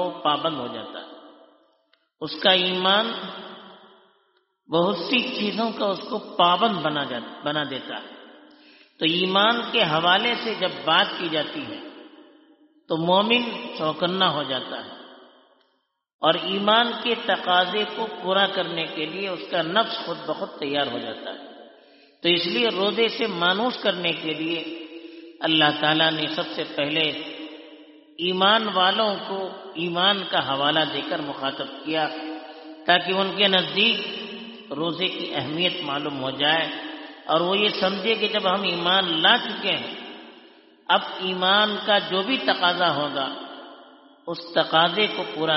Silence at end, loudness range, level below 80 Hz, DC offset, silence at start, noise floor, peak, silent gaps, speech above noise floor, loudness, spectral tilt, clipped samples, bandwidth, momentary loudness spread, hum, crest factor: 0 s; 4 LU; -72 dBFS; under 0.1%; 0 s; -71 dBFS; -4 dBFS; 16.14-16.19 s; 48 dB; -22 LUFS; -1 dB/octave; under 0.1%; 6 kHz; 16 LU; none; 22 dB